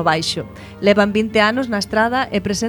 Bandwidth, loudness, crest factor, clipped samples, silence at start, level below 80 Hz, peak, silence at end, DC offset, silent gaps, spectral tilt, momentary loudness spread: 19 kHz; -17 LUFS; 18 dB; under 0.1%; 0 s; -44 dBFS; 0 dBFS; 0 s; under 0.1%; none; -4.5 dB/octave; 7 LU